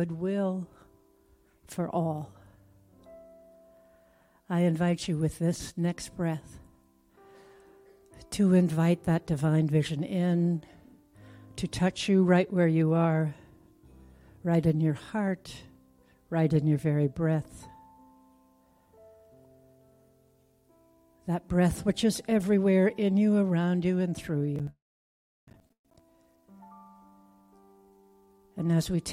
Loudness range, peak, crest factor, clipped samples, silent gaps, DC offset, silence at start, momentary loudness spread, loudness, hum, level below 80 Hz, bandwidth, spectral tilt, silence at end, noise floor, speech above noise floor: 11 LU; -12 dBFS; 18 dB; under 0.1%; 24.82-25.47 s, 25.79-25.84 s; under 0.1%; 0 s; 14 LU; -28 LUFS; none; -56 dBFS; 14.5 kHz; -7 dB/octave; 0 s; -65 dBFS; 38 dB